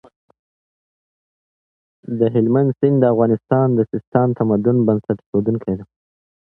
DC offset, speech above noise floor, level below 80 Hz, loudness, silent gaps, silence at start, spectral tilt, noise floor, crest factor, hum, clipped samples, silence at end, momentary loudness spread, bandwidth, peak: under 0.1%; over 73 dB; -54 dBFS; -17 LUFS; 4.07-4.12 s, 5.26-5.33 s; 2.1 s; -12.5 dB/octave; under -90 dBFS; 18 dB; none; under 0.1%; 0.65 s; 6 LU; 3.9 kHz; 0 dBFS